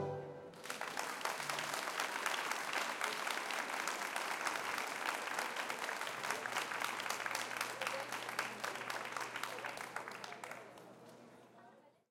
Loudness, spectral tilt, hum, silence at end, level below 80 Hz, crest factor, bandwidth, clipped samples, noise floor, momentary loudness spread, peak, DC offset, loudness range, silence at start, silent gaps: -40 LUFS; -1.5 dB/octave; none; 0.2 s; -88 dBFS; 24 dB; 17 kHz; under 0.1%; -64 dBFS; 11 LU; -20 dBFS; under 0.1%; 5 LU; 0 s; none